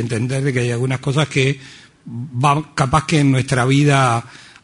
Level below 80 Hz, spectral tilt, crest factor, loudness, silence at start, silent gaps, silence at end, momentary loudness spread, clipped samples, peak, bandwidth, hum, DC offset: -44 dBFS; -6 dB/octave; 16 dB; -17 LUFS; 0 s; none; 0.25 s; 10 LU; under 0.1%; -2 dBFS; 11 kHz; none; under 0.1%